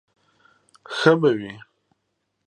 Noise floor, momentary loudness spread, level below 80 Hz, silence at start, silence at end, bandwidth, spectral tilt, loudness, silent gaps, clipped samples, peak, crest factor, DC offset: -75 dBFS; 21 LU; -70 dBFS; 0.9 s; 0.85 s; 10 kHz; -6 dB/octave; -20 LUFS; none; under 0.1%; -2 dBFS; 24 dB; under 0.1%